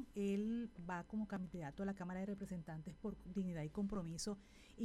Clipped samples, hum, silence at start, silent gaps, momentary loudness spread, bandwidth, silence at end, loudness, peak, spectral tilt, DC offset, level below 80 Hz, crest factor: under 0.1%; none; 0 s; none; 8 LU; 13 kHz; 0 s; -46 LUFS; -32 dBFS; -6 dB/octave; under 0.1%; -62 dBFS; 14 dB